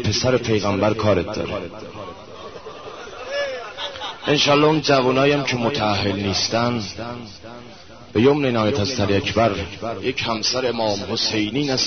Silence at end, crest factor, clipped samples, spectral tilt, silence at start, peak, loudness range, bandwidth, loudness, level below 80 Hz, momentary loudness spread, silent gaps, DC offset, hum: 0 s; 18 dB; under 0.1%; -4.5 dB/octave; 0 s; -2 dBFS; 6 LU; 6.6 kHz; -20 LUFS; -48 dBFS; 19 LU; none; 0.4%; none